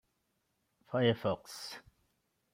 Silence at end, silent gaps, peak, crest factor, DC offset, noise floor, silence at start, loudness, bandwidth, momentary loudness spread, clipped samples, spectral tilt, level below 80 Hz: 0.75 s; none; -16 dBFS; 22 dB; under 0.1%; -80 dBFS; 0.9 s; -34 LUFS; 16 kHz; 15 LU; under 0.1%; -5.5 dB/octave; -72 dBFS